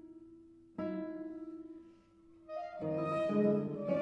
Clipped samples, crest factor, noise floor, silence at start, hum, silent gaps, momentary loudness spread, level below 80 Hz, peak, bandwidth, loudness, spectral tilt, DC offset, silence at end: under 0.1%; 18 dB; -62 dBFS; 0.05 s; none; none; 23 LU; -76 dBFS; -20 dBFS; 8.6 kHz; -37 LUFS; -9 dB/octave; under 0.1%; 0 s